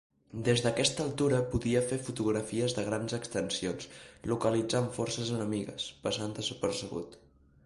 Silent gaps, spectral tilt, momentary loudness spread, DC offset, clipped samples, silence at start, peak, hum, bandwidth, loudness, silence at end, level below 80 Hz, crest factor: none; -4.5 dB/octave; 9 LU; under 0.1%; under 0.1%; 0.35 s; -12 dBFS; none; 11.5 kHz; -32 LUFS; 0.5 s; -56 dBFS; 20 dB